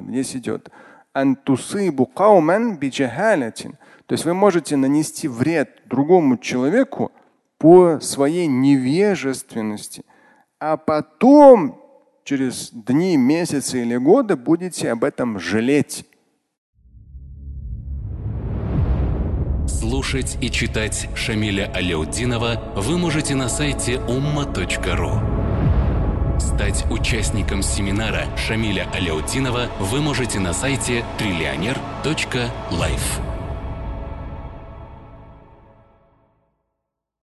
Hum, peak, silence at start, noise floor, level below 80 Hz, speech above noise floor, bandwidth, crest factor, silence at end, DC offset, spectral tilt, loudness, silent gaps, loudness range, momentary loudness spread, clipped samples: none; 0 dBFS; 0 s; -79 dBFS; -30 dBFS; 61 dB; 12.5 kHz; 20 dB; 1.85 s; under 0.1%; -5.5 dB/octave; -19 LUFS; 16.58-16.73 s; 9 LU; 13 LU; under 0.1%